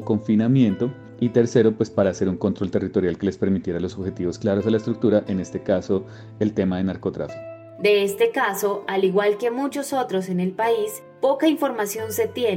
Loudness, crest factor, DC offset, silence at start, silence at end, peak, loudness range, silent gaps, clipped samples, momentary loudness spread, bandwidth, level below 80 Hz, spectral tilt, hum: -22 LUFS; 18 dB; under 0.1%; 0 s; 0 s; -4 dBFS; 2 LU; none; under 0.1%; 8 LU; 16.5 kHz; -56 dBFS; -6 dB/octave; none